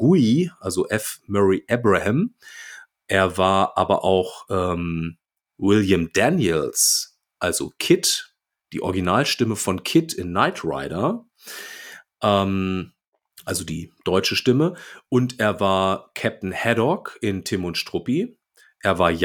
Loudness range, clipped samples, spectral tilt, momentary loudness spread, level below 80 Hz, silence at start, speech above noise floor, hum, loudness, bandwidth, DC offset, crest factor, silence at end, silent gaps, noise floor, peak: 4 LU; under 0.1%; -4.5 dB/octave; 14 LU; -52 dBFS; 0 s; 31 dB; none; -21 LUFS; 19.5 kHz; under 0.1%; 20 dB; 0 s; 13.08-13.12 s; -52 dBFS; -2 dBFS